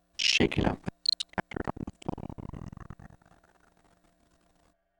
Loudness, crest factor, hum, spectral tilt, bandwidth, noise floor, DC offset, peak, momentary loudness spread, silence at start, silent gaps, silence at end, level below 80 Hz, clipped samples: -30 LUFS; 24 dB; none; -3.5 dB/octave; over 20 kHz; -69 dBFS; under 0.1%; -10 dBFS; 22 LU; 0.2 s; none; 1.85 s; -48 dBFS; under 0.1%